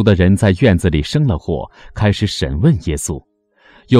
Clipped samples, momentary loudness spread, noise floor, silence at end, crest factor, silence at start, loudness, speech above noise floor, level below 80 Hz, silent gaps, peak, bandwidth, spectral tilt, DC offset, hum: under 0.1%; 12 LU; -49 dBFS; 0 s; 14 dB; 0 s; -16 LUFS; 35 dB; -30 dBFS; none; 0 dBFS; 14 kHz; -6.5 dB/octave; under 0.1%; none